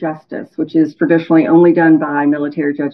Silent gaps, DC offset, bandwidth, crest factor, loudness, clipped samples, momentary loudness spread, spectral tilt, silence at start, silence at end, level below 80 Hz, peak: none; under 0.1%; 5.6 kHz; 12 dB; -13 LUFS; under 0.1%; 13 LU; -10 dB/octave; 0 s; 0 s; -64 dBFS; 0 dBFS